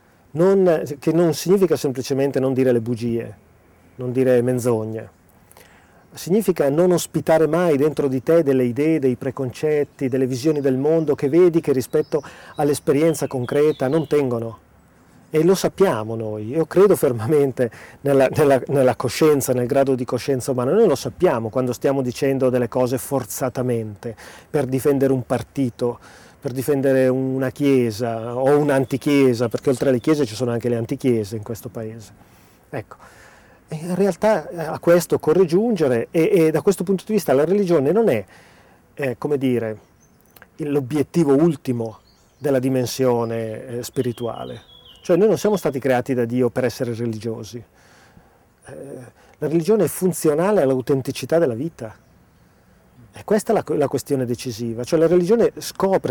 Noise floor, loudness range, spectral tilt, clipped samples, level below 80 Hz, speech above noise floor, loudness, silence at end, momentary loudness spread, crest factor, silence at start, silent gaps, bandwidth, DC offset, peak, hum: -54 dBFS; 6 LU; -6.5 dB/octave; under 0.1%; -56 dBFS; 35 dB; -20 LUFS; 0 s; 13 LU; 14 dB; 0.35 s; none; 19.5 kHz; under 0.1%; -6 dBFS; none